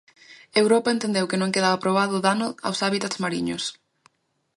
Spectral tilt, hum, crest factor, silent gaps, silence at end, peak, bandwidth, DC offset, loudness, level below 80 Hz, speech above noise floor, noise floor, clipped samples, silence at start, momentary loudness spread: -4 dB/octave; none; 20 dB; none; 0.85 s; -4 dBFS; 11.5 kHz; under 0.1%; -23 LUFS; -66 dBFS; 40 dB; -63 dBFS; under 0.1%; 0.3 s; 7 LU